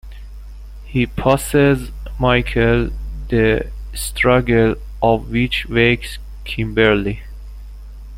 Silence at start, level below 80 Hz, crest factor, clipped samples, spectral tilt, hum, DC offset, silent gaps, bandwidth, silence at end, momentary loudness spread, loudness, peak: 0.05 s; -28 dBFS; 16 dB; under 0.1%; -5.5 dB/octave; 50 Hz at -30 dBFS; under 0.1%; none; 16.5 kHz; 0 s; 23 LU; -17 LUFS; -2 dBFS